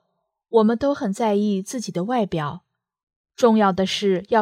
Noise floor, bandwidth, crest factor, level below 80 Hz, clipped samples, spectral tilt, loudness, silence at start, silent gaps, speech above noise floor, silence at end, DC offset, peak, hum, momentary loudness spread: -75 dBFS; 14.5 kHz; 18 dB; -58 dBFS; under 0.1%; -5.5 dB/octave; -21 LUFS; 0.5 s; 3.03-3.07 s, 3.16-3.24 s; 55 dB; 0 s; under 0.1%; -4 dBFS; none; 10 LU